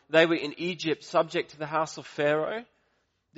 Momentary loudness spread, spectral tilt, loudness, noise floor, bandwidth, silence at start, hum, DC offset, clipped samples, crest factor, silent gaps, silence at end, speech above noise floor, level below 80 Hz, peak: 10 LU; -3 dB/octave; -28 LUFS; -73 dBFS; 8 kHz; 0.1 s; none; under 0.1%; under 0.1%; 22 dB; none; 0.75 s; 46 dB; -74 dBFS; -6 dBFS